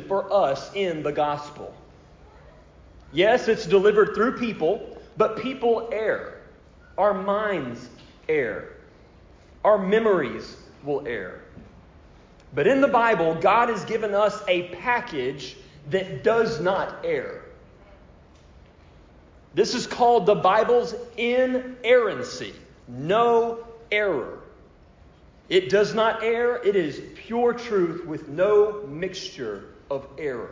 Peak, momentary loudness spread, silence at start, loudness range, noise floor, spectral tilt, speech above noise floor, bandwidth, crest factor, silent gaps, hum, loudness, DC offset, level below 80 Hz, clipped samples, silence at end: -6 dBFS; 18 LU; 0 s; 5 LU; -52 dBFS; -5.5 dB/octave; 29 dB; 7.6 kHz; 18 dB; none; none; -23 LUFS; under 0.1%; -54 dBFS; under 0.1%; 0 s